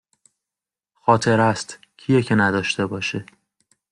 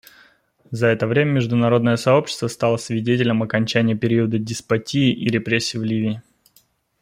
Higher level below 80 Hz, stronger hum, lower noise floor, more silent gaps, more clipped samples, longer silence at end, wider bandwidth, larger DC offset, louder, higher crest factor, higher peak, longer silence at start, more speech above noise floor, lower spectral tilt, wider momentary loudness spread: about the same, -60 dBFS vs -58 dBFS; neither; first, -89 dBFS vs -59 dBFS; neither; neither; about the same, 0.7 s vs 0.8 s; second, 11 kHz vs 15.5 kHz; neither; about the same, -20 LUFS vs -20 LUFS; about the same, 20 dB vs 18 dB; about the same, -2 dBFS vs -2 dBFS; first, 1.05 s vs 0.7 s; first, 69 dB vs 40 dB; about the same, -5.5 dB/octave vs -6 dB/octave; first, 14 LU vs 6 LU